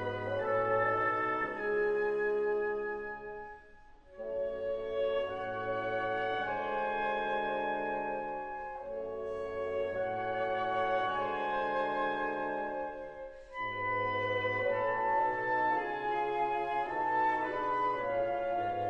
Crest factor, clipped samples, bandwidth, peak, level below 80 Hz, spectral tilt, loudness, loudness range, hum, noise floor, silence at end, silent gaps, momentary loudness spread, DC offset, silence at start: 16 dB; under 0.1%; 7.2 kHz; -18 dBFS; -60 dBFS; -6.5 dB/octave; -33 LUFS; 4 LU; none; -56 dBFS; 0 s; none; 9 LU; under 0.1%; 0 s